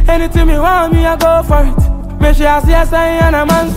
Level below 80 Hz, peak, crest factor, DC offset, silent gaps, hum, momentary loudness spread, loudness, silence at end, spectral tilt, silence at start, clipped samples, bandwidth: -12 dBFS; 0 dBFS; 8 dB; under 0.1%; none; none; 4 LU; -11 LUFS; 0 s; -6.5 dB/octave; 0 s; under 0.1%; 16 kHz